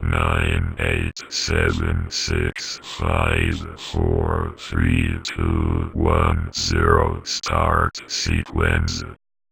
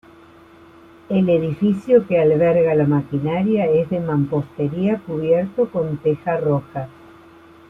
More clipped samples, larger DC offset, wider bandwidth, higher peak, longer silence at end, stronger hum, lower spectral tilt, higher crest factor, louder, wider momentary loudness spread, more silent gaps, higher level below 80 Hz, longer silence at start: neither; neither; first, 13 kHz vs 4.3 kHz; about the same, 0 dBFS vs -2 dBFS; second, 0.35 s vs 0.8 s; neither; second, -5 dB/octave vs -10 dB/octave; about the same, 20 dB vs 16 dB; about the same, -21 LUFS vs -19 LUFS; about the same, 7 LU vs 7 LU; neither; first, -28 dBFS vs -54 dBFS; second, 0 s vs 1.1 s